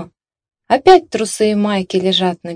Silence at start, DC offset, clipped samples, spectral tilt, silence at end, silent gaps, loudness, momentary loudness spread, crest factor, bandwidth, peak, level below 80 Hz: 0 s; under 0.1%; 0.8%; -4.5 dB/octave; 0 s; none; -14 LUFS; 7 LU; 14 dB; 11 kHz; 0 dBFS; -50 dBFS